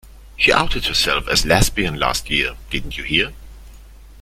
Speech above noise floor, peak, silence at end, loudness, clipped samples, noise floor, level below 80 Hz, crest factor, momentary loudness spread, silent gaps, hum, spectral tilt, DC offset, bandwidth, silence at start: 22 dB; 0 dBFS; 0 s; -18 LUFS; under 0.1%; -41 dBFS; -30 dBFS; 20 dB; 10 LU; none; none; -3 dB/octave; under 0.1%; 16 kHz; 0.05 s